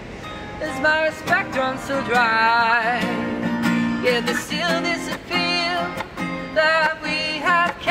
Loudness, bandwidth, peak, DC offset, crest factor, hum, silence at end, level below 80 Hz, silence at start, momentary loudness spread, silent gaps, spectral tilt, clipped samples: -20 LUFS; 16 kHz; -6 dBFS; under 0.1%; 16 dB; none; 0 s; -50 dBFS; 0 s; 11 LU; none; -4 dB/octave; under 0.1%